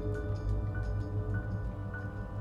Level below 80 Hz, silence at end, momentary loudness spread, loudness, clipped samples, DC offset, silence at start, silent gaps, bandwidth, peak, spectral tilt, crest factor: -40 dBFS; 0 s; 4 LU; -37 LUFS; under 0.1%; under 0.1%; 0 s; none; 7 kHz; -22 dBFS; -9 dB/octave; 12 dB